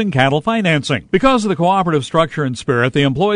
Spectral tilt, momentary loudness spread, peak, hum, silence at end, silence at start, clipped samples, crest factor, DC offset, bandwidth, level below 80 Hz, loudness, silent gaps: -6 dB/octave; 4 LU; 0 dBFS; none; 0 s; 0 s; under 0.1%; 14 dB; under 0.1%; 10.5 kHz; -42 dBFS; -15 LUFS; none